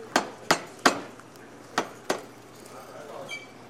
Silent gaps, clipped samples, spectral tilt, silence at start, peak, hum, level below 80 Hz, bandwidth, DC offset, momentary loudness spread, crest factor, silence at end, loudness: none; under 0.1%; -2.5 dB/octave; 0 s; -2 dBFS; none; -66 dBFS; 16 kHz; under 0.1%; 22 LU; 30 dB; 0 s; -29 LUFS